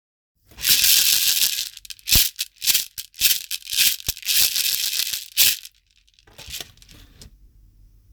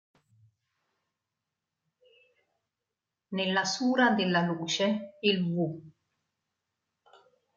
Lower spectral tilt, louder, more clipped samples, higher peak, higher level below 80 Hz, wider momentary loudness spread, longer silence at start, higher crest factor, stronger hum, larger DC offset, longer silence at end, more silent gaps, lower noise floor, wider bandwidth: second, 1.5 dB/octave vs -4.5 dB/octave; first, -17 LUFS vs -28 LUFS; neither; first, 0 dBFS vs -12 dBFS; first, -44 dBFS vs -80 dBFS; first, 18 LU vs 9 LU; second, 0.55 s vs 3.3 s; about the same, 22 dB vs 22 dB; neither; neither; second, 0.9 s vs 1.65 s; neither; second, -60 dBFS vs -88 dBFS; first, over 20 kHz vs 7.6 kHz